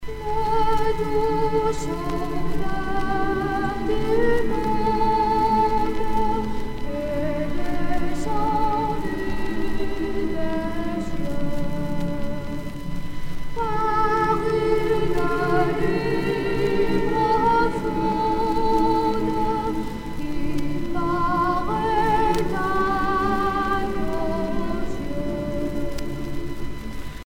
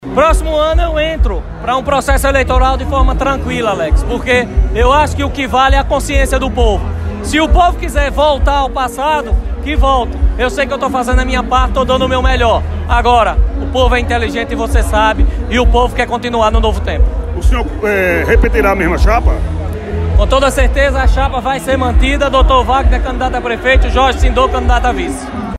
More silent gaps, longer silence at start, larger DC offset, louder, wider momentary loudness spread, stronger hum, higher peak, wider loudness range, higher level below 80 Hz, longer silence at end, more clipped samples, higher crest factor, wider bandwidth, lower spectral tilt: neither; about the same, 0 s vs 0 s; neither; second, -24 LUFS vs -13 LUFS; first, 10 LU vs 6 LU; neither; second, -8 dBFS vs 0 dBFS; first, 6 LU vs 2 LU; second, -34 dBFS vs -14 dBFS; about the same, 0.05 s vs 0 s; neither; about the same, 14 dB vs 12 dB; about the same, 12.5 kHz vs 13 kHz; about the same, -6.5 dB/octave vs -5.5 dB/octave